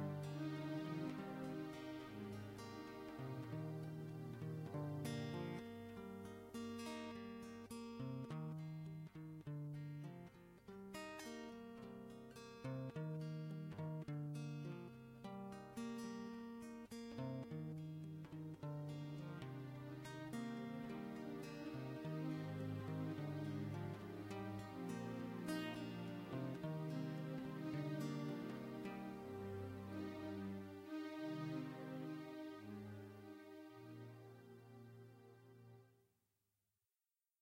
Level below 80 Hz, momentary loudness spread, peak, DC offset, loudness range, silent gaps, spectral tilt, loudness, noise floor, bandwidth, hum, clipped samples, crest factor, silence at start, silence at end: -78 dBFS; 11 LU; -32 dBFS; under 0.1%; 6 LU; none; -7 dB/octave; -50 LUFS; under -90 dBFS; 16 kHz; none; under 0.1%; 18 dB; 0 s; 1.45 s